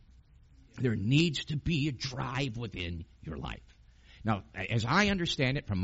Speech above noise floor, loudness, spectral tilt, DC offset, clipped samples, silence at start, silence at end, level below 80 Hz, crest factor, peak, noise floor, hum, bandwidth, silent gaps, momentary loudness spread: 27 dB; -31 LUFS; -4.5 dB/octave; under 0.1%; under 0.1%; 0.75 s; 0 s; -50 dBFS; 22 dB; -10 dBFS; -59 dBFS; none; 8 kHz; none; 14 LU